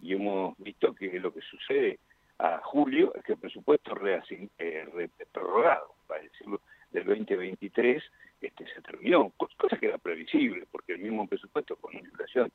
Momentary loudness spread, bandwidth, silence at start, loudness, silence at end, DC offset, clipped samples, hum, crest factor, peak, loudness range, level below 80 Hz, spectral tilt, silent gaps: 16 LU; 4.4 kHz; 0 s; -30 LUFS; 0.05 s; under 0.1%; under 0.1%; none; 20 dB; -10 dBFS; 3 LU; -76 dBFS; -7.5 dB/octave; none